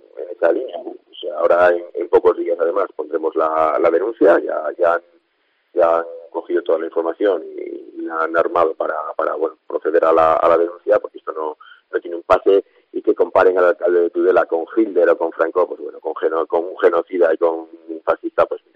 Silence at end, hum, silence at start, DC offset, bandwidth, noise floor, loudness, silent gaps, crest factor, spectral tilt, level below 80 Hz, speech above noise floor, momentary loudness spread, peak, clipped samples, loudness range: 0.2 s; none; 0.15 s; under 0.1%; 5.6 kHz; -65 dBFS; -18 LUFS; none; 16 dB; -6.5 dB/octave; -58 dBFS; 48 dB; 13 LU; -2 dBFS; under 0.1%; 4 LU